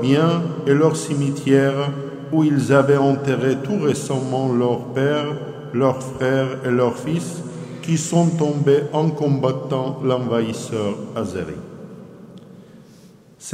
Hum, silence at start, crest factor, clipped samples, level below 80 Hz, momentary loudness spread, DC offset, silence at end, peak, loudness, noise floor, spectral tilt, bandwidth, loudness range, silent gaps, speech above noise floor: none; 0 s; 18 dB; under 0.1%; -58 dBFS; 13 LU; under 0.1%; 0 s; -2 dBFS; -20 LUFS; -47 dBFS; -6.5 dB/octave; 14.5 kHz; 6 LU; none; 28 dB